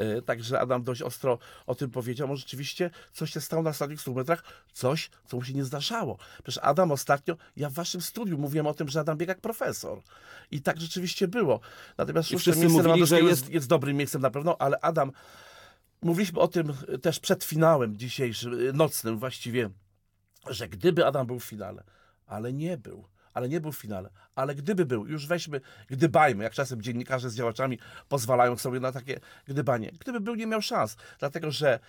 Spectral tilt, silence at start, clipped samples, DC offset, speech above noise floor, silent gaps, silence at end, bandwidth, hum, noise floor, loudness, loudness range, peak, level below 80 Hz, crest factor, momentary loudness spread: -5.5 dB/octave; 0 s; under 0.1%; under 0.1%; 42 dB; none; 0.1 s; 19.5 kHz; none; -70 dBFS; -28 LUFS; 8 LU; -10 dBFS; -66 dBFS; 18 dB; 14 LU